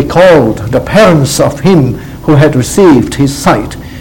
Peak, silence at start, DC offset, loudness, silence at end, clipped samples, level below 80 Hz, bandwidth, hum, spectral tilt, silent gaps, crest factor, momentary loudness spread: 0 dBFS; 0 s; 1%; -7 LUFS; 0 s; 3%; -28 dBFS; 18.5 kHz; none; -6 dB/octave; none; 8 dB; 8 LU